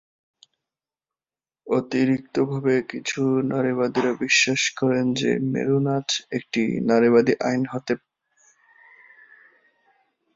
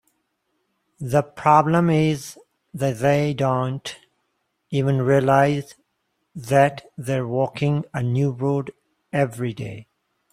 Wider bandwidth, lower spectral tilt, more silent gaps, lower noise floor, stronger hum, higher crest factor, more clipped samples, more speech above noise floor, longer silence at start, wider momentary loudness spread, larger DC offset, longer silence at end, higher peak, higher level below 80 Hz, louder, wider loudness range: second, 7.8 kHz vs 14.5 kHz; second, -4.5 dB/octave vs -7 dB/octave; neither; first, under -90 dBFS vs -73 dBFS; neither; about the same, 20 dB vs 20 dB; neither; first, over 68 dB vs 53 dB; first, 1.65 s vs 1 s; second, 8 LU vs 18 LU; neither; first, 2.4 s vs 0.5 s; about the same, -4 dBFS vs -2 dBFS; second, -64 dBFS vs -58 dBFS; about the same, -22 LUFS vs -21 LUFS; about the same, 4 LU vs 3 LU